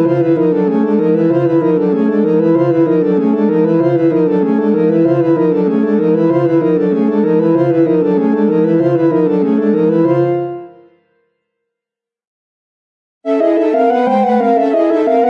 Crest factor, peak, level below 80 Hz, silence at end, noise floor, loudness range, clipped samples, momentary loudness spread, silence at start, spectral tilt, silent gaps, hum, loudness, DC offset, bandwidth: 12 dB; -2 dBFS; -64 dBFS; 0 s; -85 dBFS; 6 LU; under 0.1%; 1 LU; 0 s; -10 dB/octave; 12.27-13.21 s; none; -12 LUFS; under 0.1%; 5.6 kHz